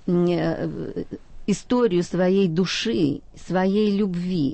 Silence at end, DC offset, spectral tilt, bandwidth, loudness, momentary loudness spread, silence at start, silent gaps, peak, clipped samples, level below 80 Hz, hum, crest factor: 0 s; under 0.1%; -6.5 dB/octave; 8.8 kHz; -23 LUFS; 11 LU; 0 s; none; -10 dBFS; under 0.1%; -46 dBFS; none; 12 dB